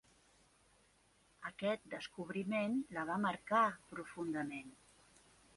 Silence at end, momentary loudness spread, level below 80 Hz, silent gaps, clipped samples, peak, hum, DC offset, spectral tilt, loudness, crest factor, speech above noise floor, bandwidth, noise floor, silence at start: 0.8 s; 16 LU; -76 dBFS; none; under 0.1%; -20 dBFS; none; under 0.1%; -5.5 dB/octave; -40 LUFS; 20 dB; 33 dB; 11.5 kHz; -72 dBFS; 1.4 s